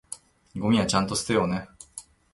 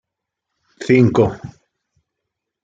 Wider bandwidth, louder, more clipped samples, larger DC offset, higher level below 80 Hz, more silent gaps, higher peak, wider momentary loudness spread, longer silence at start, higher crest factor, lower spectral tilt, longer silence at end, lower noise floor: first, 12 kHz vs 7.8 kHz; second, -25 LUFS vs -15 LUFS; neither; neither; about the same, -52 dBFS vs -50 dBFS; neither; second, -8 dBFS vs -2 dBFS; about the same, 20 LU vs 22 LU; second, 0.1 s vs 0.8 s; about the same, 20 dB vs 18 dB; second, -4.5 dB/octave vs -8 dB/octave; second, 0.3 s vs 1.15 s; second, -47 dBFS vs -80 dBFS